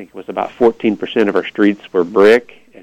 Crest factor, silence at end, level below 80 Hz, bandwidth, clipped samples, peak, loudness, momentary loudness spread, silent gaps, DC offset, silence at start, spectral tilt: 14 dB; 0.4 s; -56 dBFS; 10.5 kHz; under 0.1%; -2 dBFS; -14 LUFS; 11 LU; none; under 0.1%; 0 s; -6.5 dB/octave